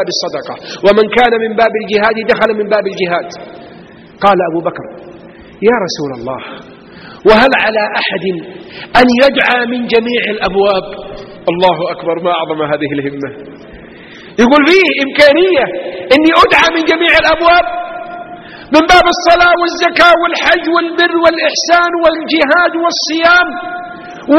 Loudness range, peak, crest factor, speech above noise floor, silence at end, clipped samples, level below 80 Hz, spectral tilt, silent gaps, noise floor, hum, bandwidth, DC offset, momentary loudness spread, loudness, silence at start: 7 LU; 0 dBFS; 12 dB; 25 dB; 0 s; 0.4%; -40 dBFS; -4 dB/octave; none; -35 dBFS; none; 12.5 kHz; under 0.1%; 17 LU; -10 LUFS; 0 s